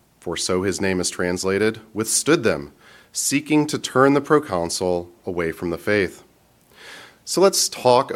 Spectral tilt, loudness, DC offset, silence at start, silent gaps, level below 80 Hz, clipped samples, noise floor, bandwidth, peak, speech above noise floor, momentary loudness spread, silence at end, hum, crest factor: -3.5 dB/octave; -21 LUFS; under 0.1%; 0.25 s; none; -54 dBFS; under 0.1%; -56 dBFS; 16.5 kHz; -2 dBFS; 35 dB; 13 LU; 0 s; none; 18 dB